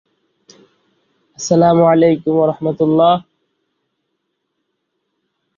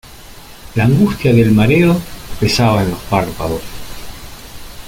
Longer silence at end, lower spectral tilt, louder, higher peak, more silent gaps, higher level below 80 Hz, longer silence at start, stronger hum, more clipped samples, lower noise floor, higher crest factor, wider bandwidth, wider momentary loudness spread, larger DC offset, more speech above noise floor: first, 2.35 s vs 0 s; about the same, -6.5 dB/octave vs -6.5 dB/octave; about the same, -13 LUFS vs -14 LUFS; about the same, -2 dBFS vs -2 dBFS; neither; second, -58 dBFS vs -34 dBFS; first, 1.4 s vs 0.05 s; neither; neither; first, -72 dBFS vs -35 dBFS; about the same, 16 dB vs 14 dB; second, 7.6 kHz vs 17 kHz; second, 7 LU vs 22 LU; neither; first, 60 dB vs 23 dB